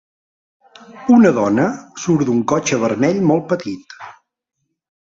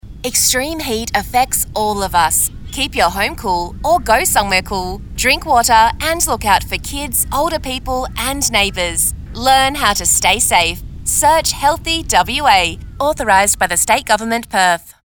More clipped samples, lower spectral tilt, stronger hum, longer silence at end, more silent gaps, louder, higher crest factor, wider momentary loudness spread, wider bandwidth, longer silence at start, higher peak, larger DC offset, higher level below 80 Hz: neither; first, -6 dB/octave vs -1.5 dB/octave; neither; first, 1 s vs 0.15 s; neither; about the same, -16 LUFS vs -14 LUFS; about the same, 16 dB vs 14 dB; first, 17 LU vs 8 LU; second, 7.6 kHz vs over 20 kHz; first, 0.9 s vs 0.05 s; about the same, -2 dBFS vs 0 dBFS; neither; second, -58 dBFS vs -32 dBFS